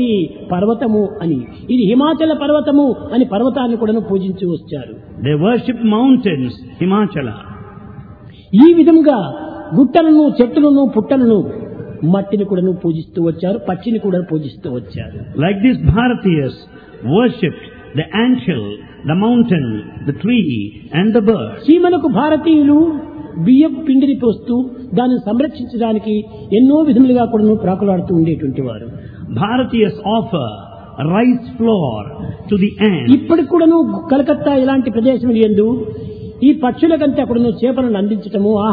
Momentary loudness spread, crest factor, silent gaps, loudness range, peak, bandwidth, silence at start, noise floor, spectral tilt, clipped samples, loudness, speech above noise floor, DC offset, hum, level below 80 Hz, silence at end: 14 LU; 14 dB; none; 5 LU; 0 dBFS; 4.9 kHz; 0 s; -36 dBFS; -11 dB/octave; under 0.1%; -14 LUFS; 23 dB; under 0.1%; none; -42 dBFS; 0 s